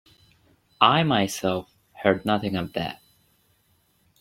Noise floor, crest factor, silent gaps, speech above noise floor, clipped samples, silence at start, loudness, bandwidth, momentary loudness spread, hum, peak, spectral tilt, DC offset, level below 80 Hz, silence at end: -66 dBFS; 24 dB; none; 43 dB; under 0.1%; 0.8 s; -23 LUFS; 16.5 kHz; 13 LU; none; -2 dBFS; -5 dB/octave; under 0.1%; -60 dBFS; 1.25 s